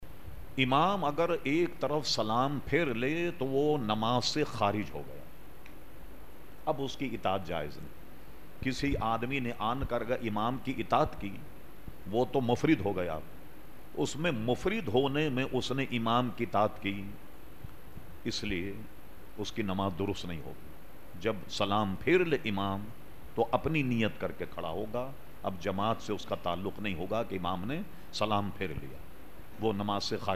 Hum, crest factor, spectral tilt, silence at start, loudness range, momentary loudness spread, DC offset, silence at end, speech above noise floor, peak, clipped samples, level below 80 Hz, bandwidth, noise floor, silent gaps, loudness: none; 20 dB; -5.5 dB/octave; 0 s; 7 LU; 22 LU; 1%; 0 s; 20 dB; -12 dBFS; under 0.1%; -52 dBFS; 15.5 kHz; -52 dBFS; none; -32 LUFS